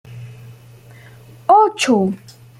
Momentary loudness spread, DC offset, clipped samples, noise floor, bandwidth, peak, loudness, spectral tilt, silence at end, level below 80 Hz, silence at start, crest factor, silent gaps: 24 LU; under 0.1%; under 0.1%; -42 dBFS; 15.5 kHz; -2 dBFS; -15 LUFS; -5 dB/octave; 0.45 s; -60 dBFS; 0.1 s; 16 dB; none